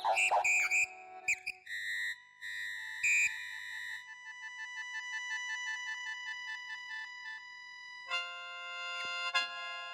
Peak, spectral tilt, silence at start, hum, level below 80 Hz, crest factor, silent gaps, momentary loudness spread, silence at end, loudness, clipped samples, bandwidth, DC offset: -18 dBFS; 2.5 dB/octave; 0 s; 50 Hz at -85 dBFS; -84 dBFS; 20 dB; none; 16 LU; 0 s; -35 LUFS; under 0.1%; 16 kHz; under 0.1%